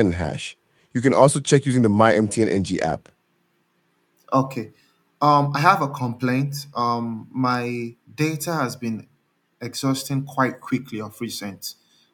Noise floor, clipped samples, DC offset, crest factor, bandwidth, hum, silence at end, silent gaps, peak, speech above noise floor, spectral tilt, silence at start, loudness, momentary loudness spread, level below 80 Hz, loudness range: -67 dBFS; under 0.1%; under 0.1%; 22 dB; 17.5 kHz; none; 0.4 s; none; 0 dBFS; 46 dB; -5.5 dB/octave; 0 s; -22 LUFS; 16 LU; -58 dBFS; 6 LU